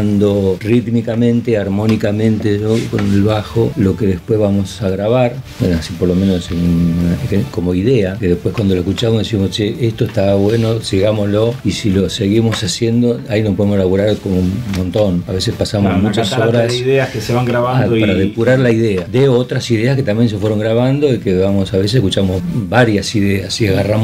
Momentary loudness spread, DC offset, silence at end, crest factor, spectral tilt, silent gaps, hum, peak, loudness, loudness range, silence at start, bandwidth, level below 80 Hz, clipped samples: 4 LU; under 0.1%; 0 s; 14 dB; -6.5 dB/octave; none; none; 0 dBFS; -14 LUFS; 2 LU; 0 s; 15.5 kHz; -38 dBFS; under 0.1%